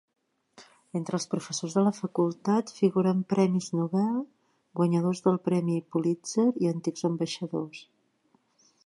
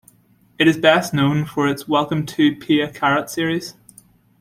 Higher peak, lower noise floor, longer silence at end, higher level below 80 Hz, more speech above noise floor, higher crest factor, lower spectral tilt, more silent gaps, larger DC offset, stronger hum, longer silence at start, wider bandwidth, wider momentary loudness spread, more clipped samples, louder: second, -10 dBFS vs -2 dBFS; first, -69 dBFS vs -55 dBFS; first, 1 s vs 0.7 s; second, -76 dBFS vs -56 dBFS; first, 42 dB vs 37 dB; about the same, 18 dB vs 18 dB; about the same, -6.5 dB/octave vs -5.5 dB/octave; neither; neither; neither; about the same, 0.6 s vs 0.6 s; second, 11.5 kHz vs 16 kHz; about the same, 9 LU vs 7 LU; neither; second, -28 LUFS vs -18 LUFS